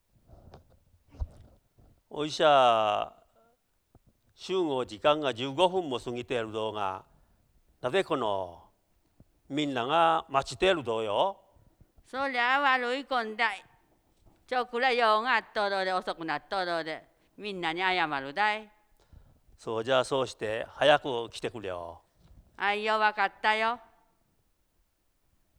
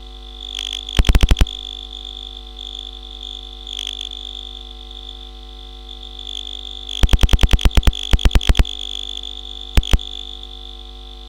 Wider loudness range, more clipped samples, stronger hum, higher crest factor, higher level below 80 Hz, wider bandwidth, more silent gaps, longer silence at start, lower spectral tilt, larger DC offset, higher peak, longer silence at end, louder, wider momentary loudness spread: second, 3 LU vs 10 LU; neither; neither; about the same, 22 dB vs 18 dB; second, -56 dBFS vs -20 dBFS; second, 12.5 kHz vs 17 kHz; neither; first, 0.55 s vs 0 s; about the same, -4 dB/octave vs -4.5 dB/octave; neither; second, -8 dBFS vs -2 dBFS; first, 1.8 s vs 0 s; second, -28 LUFS vs -22 LUFS; about the same, 15 LU vs 17 LU